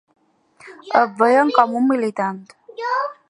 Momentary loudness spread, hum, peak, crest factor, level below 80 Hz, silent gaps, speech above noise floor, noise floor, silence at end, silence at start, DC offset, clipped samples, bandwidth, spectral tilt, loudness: 14 LU; none; 0 dBFS; 20 dB; -74 dBFS; none; 33 dB; -51 dBFS; 0.15 s; 0.65 s; under 0.1%; under 0.1%; 11 kHz; -5.5 dB/octave; -18 LUFS